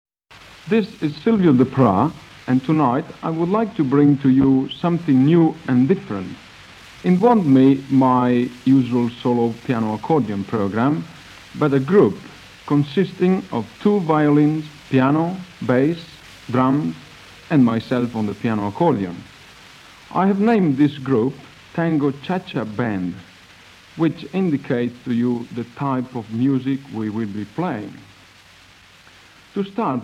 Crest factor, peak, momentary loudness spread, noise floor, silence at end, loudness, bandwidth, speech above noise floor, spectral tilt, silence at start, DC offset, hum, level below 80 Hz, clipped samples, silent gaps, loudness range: 16 dB; -4 dBFS; 13 LU; -48 dBFS; 0 s; -19 LUFS; 9.2 kHz; 30 dB; -8.5 dB/octave; 0.65 s; under 0.1%; none; -56 dBFS; under 0.1%; none; 7 LU